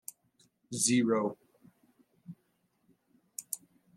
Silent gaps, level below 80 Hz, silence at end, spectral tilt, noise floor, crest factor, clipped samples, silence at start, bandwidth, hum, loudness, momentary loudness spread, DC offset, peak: none; -80 dBFS; 0.4 s; -3.5 dB/octave; -75 dBFS; 24 dB; under 0.1%; 0.7 s; 15.5 kHz; none; -31 LUFS; 26 LU; under 0.1%; -12 dBFS